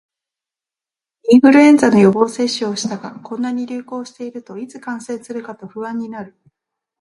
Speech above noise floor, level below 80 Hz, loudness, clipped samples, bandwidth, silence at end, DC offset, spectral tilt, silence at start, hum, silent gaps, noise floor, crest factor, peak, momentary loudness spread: 74 dB; -62 dBFS; -14 LUFS; under 0.1%; 11.5 kHz; 0.7 s; under 0.1%; -5.5 dB/octave; 1.25 s; none; none; -89 dBFS; 16 dB; 0 dBFS; 20 LU